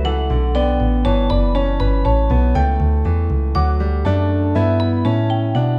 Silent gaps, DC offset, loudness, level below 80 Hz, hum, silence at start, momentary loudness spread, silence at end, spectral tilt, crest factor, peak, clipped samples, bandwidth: none; under 0.1%; -18 LUFS; -18 dBFS; none; 0 s; 2 LU; 0 s; -9.5 dB/octave; 12 dB; -4 dBFS; under 0.1%; 5.2 kHz